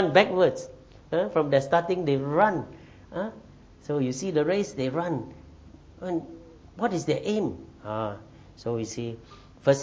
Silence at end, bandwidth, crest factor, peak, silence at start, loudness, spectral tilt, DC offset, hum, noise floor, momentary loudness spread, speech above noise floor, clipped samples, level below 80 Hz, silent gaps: 0 s; 8 kHz; 22 dB; -6 dBFS; 0 s; -27 LUFS; -6 dB/octave; under 0.1%; none; -49 dBFS; 19 LU; 23 dB; under 0.1%; -56 dBFS; none